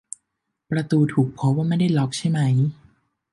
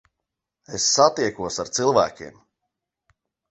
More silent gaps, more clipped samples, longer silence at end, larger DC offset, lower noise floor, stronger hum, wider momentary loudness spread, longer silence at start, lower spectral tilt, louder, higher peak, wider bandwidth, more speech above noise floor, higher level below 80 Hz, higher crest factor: neither; neither; second, 0.6 s vs 1.2 s; neither; second, -79 dBFS vs -83 dBFS; neither; second, 8 LU vs 18 LU; about the same, 0.7 s vs 0.7 s; first, -7 dB/octave vs -2.5 dB/octave; about the same, -21 LUFS vs -21 LUFS; second, -8 dBFS vs -2 dBFS; first, 11.5 kHz vs 8.4 kHz; about the same, 59 dB vs 62 dB; about the same, -60 dBFS vs -58 dBFS; second, 14 dB vs 22 dB